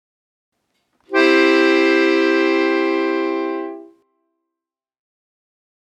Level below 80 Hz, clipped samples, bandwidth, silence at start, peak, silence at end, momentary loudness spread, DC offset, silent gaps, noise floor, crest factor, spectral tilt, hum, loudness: -86 dBFS; under 0.1%; 8.8 kHz; 1.1 s; 0 dBFS; 2.2 s; 10 LU; under 0.1%; none; -85 dBFS; 18 dB; -2.5 dB/octave; none; -16 LUFS